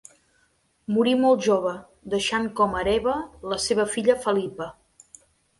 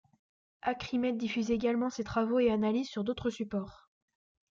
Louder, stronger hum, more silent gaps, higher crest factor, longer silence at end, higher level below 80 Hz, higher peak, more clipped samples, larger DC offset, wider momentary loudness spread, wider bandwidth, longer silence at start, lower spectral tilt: first, -23 LUFS vs -32 LUFS; neither; neither; about the same, 18 dB vs 16 dB; about the same, 0.85 s vs 0.75 s; first, -52 dBFS vs -60 dBFS; first, -6 dBFS vs -18 dBFS; neither; neither; first, 13 LU vs 9 LU; first, 11.5 kHz vs 7.4 kHz; first, 0.9 s vs 0.65 s; second, -4 dB/octave vs -6 dB/octave